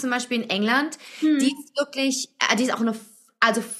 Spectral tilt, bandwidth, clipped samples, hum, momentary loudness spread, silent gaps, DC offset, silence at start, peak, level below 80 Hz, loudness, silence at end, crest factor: -3 dB/octave; 14.5 kHz; under 0.1%; none; 7 LU; none; under 0.1%; 0 s; -2 dBFS; -78 dBFS; -23 LUFS; 0 s; 22 dB